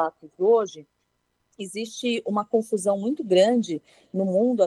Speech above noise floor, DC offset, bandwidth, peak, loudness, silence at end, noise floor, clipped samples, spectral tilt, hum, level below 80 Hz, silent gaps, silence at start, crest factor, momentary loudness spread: 50 dB; under 0.1%; 12.5 kHz; -8 dBFS; -24 LUFS; 0 s; -73 dBFS; under 0.1%; -5.5 dB/octave; 60 Hz at -50 dBFS; -74 dBFS; none; 0 s; 16 dB; 14 LU